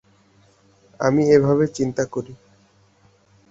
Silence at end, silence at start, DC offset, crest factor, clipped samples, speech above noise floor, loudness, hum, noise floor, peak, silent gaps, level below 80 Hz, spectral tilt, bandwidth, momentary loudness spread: 1.15 s; 1 s; under 0.1%; 20 dB; under 0.1%; 39 dB; -19 LUFS; none; -57 dBFS; -2 dBFS; none; -56 dBFS; -7 dB/octave; 7.8 kHz; 14 LU